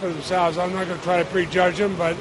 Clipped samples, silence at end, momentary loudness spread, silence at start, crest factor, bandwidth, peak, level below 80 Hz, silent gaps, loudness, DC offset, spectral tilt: under 0.1%; 0 s; 5 LU; 0 s; 16 dB; 11.5 kHz; -6 dBFS; -50 dBFS; none; -22 LUFS; under 0.1%; -5.5 dB/octave